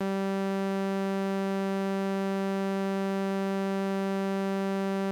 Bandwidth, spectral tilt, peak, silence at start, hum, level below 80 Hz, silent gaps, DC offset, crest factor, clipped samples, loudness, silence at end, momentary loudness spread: 15 kHz; -7 dB/octave; -20 dBFS; 0 s; none; -88 dBFS; none; under 0.1%; 8 dB; under 0.1%; -30 LUFS; 0 s; 0 LU